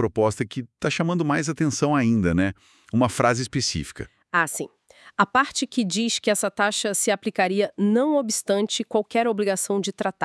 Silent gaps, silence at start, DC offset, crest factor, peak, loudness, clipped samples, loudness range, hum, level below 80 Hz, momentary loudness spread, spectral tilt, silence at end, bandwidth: none; 0 s; under 0.1%; 20 dB; -4 dBFS; -23 LUFS; under 0.1%; 2 LU; none; -54 dBFS; 7 LU; -4 dB/octave; 0 s; 12 kHz